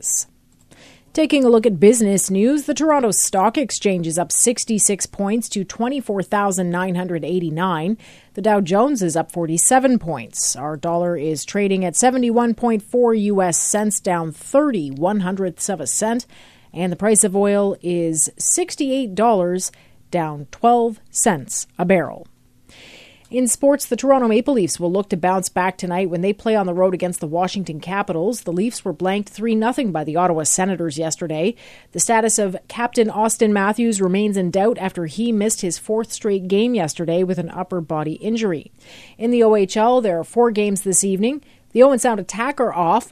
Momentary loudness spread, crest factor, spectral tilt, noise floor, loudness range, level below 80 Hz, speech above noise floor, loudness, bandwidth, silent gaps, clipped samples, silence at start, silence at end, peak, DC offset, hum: 9 LU; 18 dB; -4.5 dB/octave; -51 dBFS; 4 LU; -54 dBFS; 33 dB; -18 LUFS; 14 kHz; none; under 0.1%; 0 s; 0.05 s; 0 dBFS; under 0.1%; none